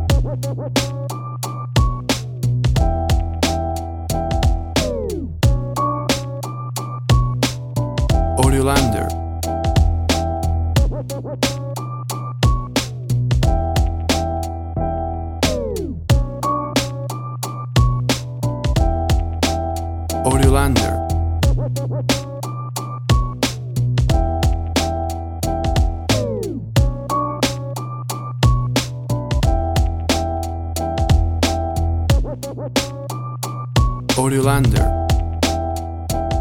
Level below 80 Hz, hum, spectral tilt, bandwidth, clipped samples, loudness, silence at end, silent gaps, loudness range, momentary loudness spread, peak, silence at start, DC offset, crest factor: -24 dBFS; none; -5.5 dB/octave; 17.5 kHz; under 0.1%; -20 LUFS; 0 s; none; 2 LU; 10 LU; -2 dBFS; 0 s; under 0.1%; 16 dB